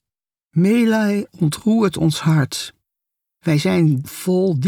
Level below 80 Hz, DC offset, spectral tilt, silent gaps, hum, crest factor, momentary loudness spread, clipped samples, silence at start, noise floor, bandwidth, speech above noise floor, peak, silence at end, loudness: -54 dBFS; under 0.1%; -6.5 dB/octave; none; none; 12 dB; 8 LU; under 0.1%; 0.55 s; -89 dBFS; 19 kHz; 73 dB; -6 dBFS; 0 s; -18 LUFS